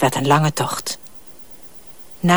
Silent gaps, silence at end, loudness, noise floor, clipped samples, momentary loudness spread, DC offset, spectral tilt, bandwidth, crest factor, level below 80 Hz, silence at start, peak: none; 0 s; -20 LUFS; -42 dBFS; under 0.1%; 23 LU; 1%; -5 dB/octave; over 20 kHz; 18 dB; -56 dBFS; 0 s; -2 dBFS